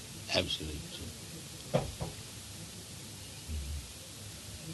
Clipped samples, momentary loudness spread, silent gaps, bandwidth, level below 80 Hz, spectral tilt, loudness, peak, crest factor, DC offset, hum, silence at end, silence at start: under 0.1%; 12 LU; none; 12 kHz; -50 dBFS; -3.5 dB/octave; -39 LUFS; -14 dBFS; 26 dB; under 0.1%; none; 0 s; 0 s